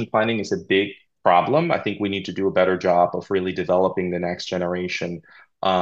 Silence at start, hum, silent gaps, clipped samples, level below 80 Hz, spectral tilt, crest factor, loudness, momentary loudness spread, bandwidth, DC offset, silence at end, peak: 0 s; none; none; under 0.1%; -60 dBFS; -6 dB/octave; 18 dB; -22 LUFS; 8 LU; 7.8 kHz; under 0.1%; 0 s; -2 dBFS